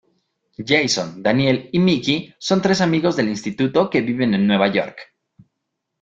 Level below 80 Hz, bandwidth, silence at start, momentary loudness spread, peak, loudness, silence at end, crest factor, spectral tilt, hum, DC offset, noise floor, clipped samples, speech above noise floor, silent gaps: -56 dBFS; 7.8 kHz; 0.6 s; 6 LU; -2 dBFS; -18 LUFS; 1 s; 18 dB; -5 dB/octave; none; under 0.1%; -78 dBFS; under 0.1%; 59 dB; none